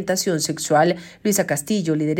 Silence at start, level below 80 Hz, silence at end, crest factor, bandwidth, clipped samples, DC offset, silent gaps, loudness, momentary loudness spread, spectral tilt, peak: 0 s; -62 dBFS; 0 s; 16 dB; 17 kHz; under 0.1%; under 0.1%; none; -20 LUFS; 4 LU; -4 dB/octave; -4 dBFS